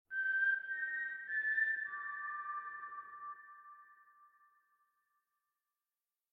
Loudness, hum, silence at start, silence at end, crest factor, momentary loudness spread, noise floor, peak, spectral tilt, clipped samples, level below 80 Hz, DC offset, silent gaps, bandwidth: -37 LUFS; none; 0.1 s; 2.05 s; 16 dB; 18 LU; under -90 dBFS; -26 dBFS; -2 dB/octave; under 0.1%; under -90 dBFS; under 0.1%; none; 4.8 kHz